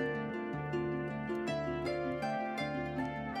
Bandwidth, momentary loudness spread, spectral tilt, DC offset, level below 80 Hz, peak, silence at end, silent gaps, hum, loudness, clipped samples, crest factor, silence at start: 13 kHz; 2 LU; -7 dB/octave; under 0.1%; -58 dBFS; -24 dBFS; 0 s; none; none; -37 LUFS; under 0.1%; 12 dB; 0 s